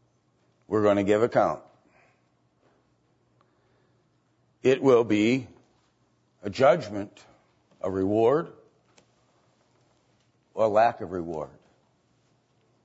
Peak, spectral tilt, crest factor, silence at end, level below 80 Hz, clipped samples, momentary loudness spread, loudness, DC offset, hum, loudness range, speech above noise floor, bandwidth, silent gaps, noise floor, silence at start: -8 dBFS; -6.5 dB/octave; 20 dB; 1.4 s; -66 dBFS; under 0.1%; 18 LU; -24 LUFS; under 0.1%; none; 5 LU; 45 dB; 8 kHz; none; -68 dBFS; 0.7 s